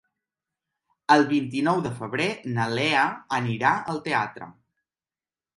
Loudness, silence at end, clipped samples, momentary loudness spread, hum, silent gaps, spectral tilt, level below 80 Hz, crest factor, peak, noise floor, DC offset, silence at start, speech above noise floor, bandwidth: -24 LUFS; 1.05 s; under 0.1%; 11 LU; none; none; -5.5 dB/octave; -66 dBFS; 22 dB; -4 dBFS; under -90 dBFS; under 0.1%; 1.1 s; over 66 dB; 11.5 kHz